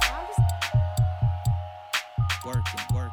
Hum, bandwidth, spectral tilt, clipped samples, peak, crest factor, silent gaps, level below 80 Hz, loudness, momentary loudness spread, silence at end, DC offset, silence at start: none; 17.5 kHz; -4.5 dB/octave; under 0.1%; -10 dBFS; 16 dB; none; -36 dBFS; -27 LUFS; 5 LU; 0 s; under 0.1%; 0 s